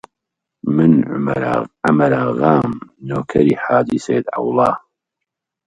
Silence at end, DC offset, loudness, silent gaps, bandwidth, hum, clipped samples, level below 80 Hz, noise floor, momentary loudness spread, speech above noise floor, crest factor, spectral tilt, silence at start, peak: 0.9 s; under 0.1%; -16 LUFS; none; 9.6 kHz; none; under 0.1%; -50 dBFS; -81 dBFS; 11 LU; 65 dB; 16 dB; -8 dB/octave; 0.65 s; 0 dBFS